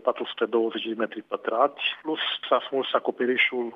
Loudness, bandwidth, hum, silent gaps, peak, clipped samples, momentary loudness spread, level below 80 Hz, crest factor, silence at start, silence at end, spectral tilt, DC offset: -26 LUFS; 5.6 kHz; none; none; -6 dBFS; under 0.1%; 7 LU; -88 dBFS; 20 dB; 0.05 s; 0 s; -5.5 dB/octave; under 0.1%